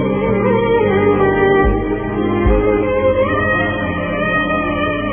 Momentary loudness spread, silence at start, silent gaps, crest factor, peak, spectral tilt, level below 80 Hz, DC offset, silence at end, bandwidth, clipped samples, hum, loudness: 5 LU; 0 s; none; 14 dB; 0 dBFS; -11 dB/octave; -26 dBFS; under 0.1%; 0 s; 3.5 kHz; under 0.1%; none; -15 LUFS